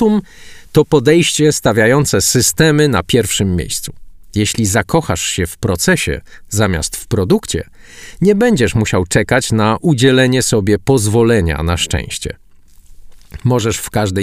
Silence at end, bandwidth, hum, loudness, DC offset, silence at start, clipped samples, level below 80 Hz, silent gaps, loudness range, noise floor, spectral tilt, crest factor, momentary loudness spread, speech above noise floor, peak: 0 s; 16 kHz; none; -14 LUFS; under 0.1%; 0 s; under 0.1%; -34 dBFS; none; 4 LU; -40 dBFS; -4.5 dB/octave; 14 dB; 10 LU; 27 dB; 0 dBFS